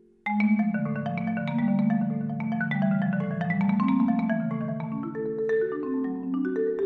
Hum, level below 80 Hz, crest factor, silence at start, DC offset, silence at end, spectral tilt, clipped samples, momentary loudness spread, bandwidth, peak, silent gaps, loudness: none; -64 dBFS; 12 dB; 0.25 s; under 0.1%; 0 s; -10 dB/octave; under 0.1%; 6 LU; 4.6 kHz; -14 dBFS; none; -27 LUFS